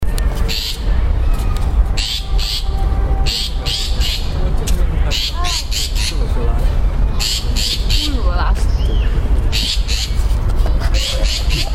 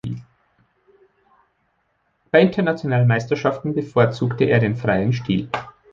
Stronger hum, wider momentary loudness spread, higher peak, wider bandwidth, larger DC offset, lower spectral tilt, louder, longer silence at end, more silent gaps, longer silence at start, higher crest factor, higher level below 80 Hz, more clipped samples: neither; second, 3 LU vs 10 LU; about the same, -2 dBFS vs -2 dBFS; first, 15 kHz vs 7.2 kHz; neither; second, -4 dB/octave vs -8 dB/octave; about the same, -18 LUFS vs -19 LUFS; second, 0 s vs 0.2 s; neither; about the same, 0 s vs 0.05 s; second, 14 dB vs 20 dB; first, -16 dBFS vs -52 dBFS; neither